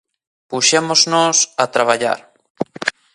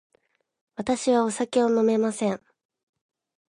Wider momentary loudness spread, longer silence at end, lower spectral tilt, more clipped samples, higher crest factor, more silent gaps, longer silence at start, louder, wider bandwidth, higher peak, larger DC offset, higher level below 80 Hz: about the same, 14 LU vs 12 LU; second, 0.25 s vs 1.1 s; second, -1.5 dB/octave vs -5 dB/octave; neither; about the same, 18 dB vs 16 dB; first, 2.50-2.55 s vs none; second, 0.5 s vs 0.8 s; first, -15 LUFS vs -24 LUFS; about the same, 11.5 kHz vs 11 kHz; first, 0 dBFS vs -10 dBFS; neither; about the same, -66 dBFS vs -66 dBFS